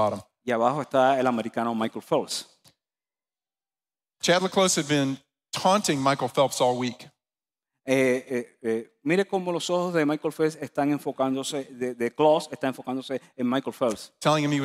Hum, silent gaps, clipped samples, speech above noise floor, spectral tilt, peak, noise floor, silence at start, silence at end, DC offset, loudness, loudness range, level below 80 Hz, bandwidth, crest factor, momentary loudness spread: none; none; under 0.1%; over 65 dB; -4.5 dB/octave; -8 dBFS; under -90 dBFS; 0 s; 0 s; under 0.1%; -26 LUFS; 3 LU; -72 dBFS; 15.5 kHz; 18 dB; 10 LU